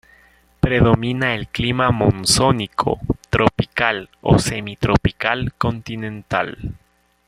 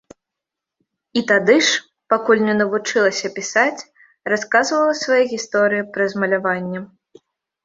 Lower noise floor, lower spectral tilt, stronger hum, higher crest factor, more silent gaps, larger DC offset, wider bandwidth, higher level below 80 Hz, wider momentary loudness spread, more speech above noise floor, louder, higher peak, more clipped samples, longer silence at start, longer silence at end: second, -53 dBFS vs -84 dBFS; first, -5 dB/octave vs -3.5 dB/octave; neither; about the same, 18 dB vs 18 dB; neither; neither; first, 15 kHz vs 7.8 kHz; first, -36 dBFS vs -66 dBFS; about the same, 9 LU vs 9 LU; second, 35 dB vs 66 dB; about the same, -19 LUFS vs -18 LUFS; about the same, 0 dBFS vs -2 dBFS; neither; second, 0.65 s vs 1.15 s; second, 0.55 s vs 0.8 s